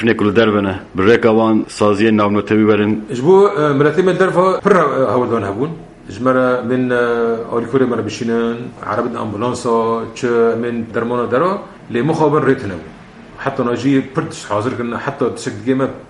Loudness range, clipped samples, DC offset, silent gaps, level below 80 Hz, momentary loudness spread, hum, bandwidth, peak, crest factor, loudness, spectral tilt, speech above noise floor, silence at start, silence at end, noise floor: 5 LU; under 0.1%; under 0.1%; none; -50 dBFS; 9 LU; none; 11 kHz; 0 dBFS; 16 dB; -15 LUFS; -6.5 dB/octave; 20 dB; 0 s; 0.05 s; -35 dBFS